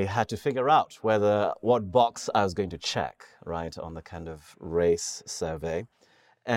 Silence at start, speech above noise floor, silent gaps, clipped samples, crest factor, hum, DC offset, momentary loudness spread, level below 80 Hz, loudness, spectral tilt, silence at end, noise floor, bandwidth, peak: 0 s; 21 dB; none; under 0.1%; 18 dB; none; under 0.1%; 17 LU; -54 dBFS; -27 LUFS; -4.5 dB/octave; 0 s; -48 dBFS; 16 kHz; -8 dBFS